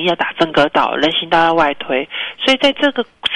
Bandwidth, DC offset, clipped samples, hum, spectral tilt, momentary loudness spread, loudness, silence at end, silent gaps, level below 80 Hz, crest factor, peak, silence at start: 11 kHz; under 0.1%; under 0.1%; none; -4.5 dB/octave; 7 LU; -15 LUFS; 0 s; none; -50 dBFS; 14 dB; -2 dBFS; 0 s